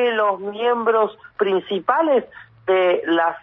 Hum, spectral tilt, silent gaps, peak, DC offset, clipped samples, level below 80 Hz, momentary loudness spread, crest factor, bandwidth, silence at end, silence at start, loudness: none; -7.5 dB/octave; none; -6 dBFS; under 0.1%; under 0.1%; -68 dBFS; 5 LU; 14 dB; 5.2 kHz; 0.05 s; 0 s; -20 LUFS